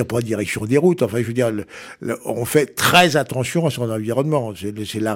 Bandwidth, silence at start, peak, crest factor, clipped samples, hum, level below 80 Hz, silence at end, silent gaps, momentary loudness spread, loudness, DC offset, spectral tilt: 17 kHz; 0 s; -2 dBFS; 18 dB; under 0.1%; none; -54 dBFS; 0 s; none; 14 LU; -19 LUFS; under 0.1%; -5 dB/octave